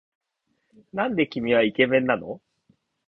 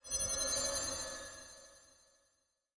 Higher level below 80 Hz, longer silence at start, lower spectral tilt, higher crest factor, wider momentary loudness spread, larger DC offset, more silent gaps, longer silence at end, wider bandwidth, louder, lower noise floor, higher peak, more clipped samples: about the same, -64 dBFS vs -60 dBFS; first, 0.95 s vs 0.05 s; first, -8 dB/octave vs -0.5 dB/octave; about the same, 20 dB vs 16 dB; second, 16 LU vs 19 LU; neither; neither; second, 0.7 s vs 0.9 s; second, 5.8 kHz vs 10.5 kHz; first, -23 LUFS vs -36 LUFS; second, -74 dBFS vs -80 dBFS; first, -6 dBFS vs -26 dBFS; neither